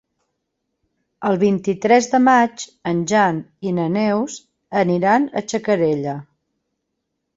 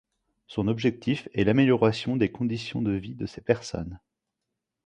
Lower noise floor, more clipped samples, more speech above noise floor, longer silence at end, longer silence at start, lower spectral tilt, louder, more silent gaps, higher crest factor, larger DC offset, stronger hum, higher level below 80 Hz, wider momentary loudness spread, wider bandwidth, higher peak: second, -76 dBFS vs -84 dBFS; neither; about the same, 58 dB vs 59 dB; first, 1.15 s vs 0.9 s; first, 1.2 s vs 0.5 s; second, -5.5 dB/octave vs -7 dB/octave; first, -18 LUFS vs -26 LUFS; neither; about the same, 18 dB vs 20 dB; neither; neither; second, -62 dBFS vs -52 dBFS; about the same, 12 LU vs 14 LU; second, 8 kHz vs 10 kHz; first, -2 dBFS vs -6 dBFS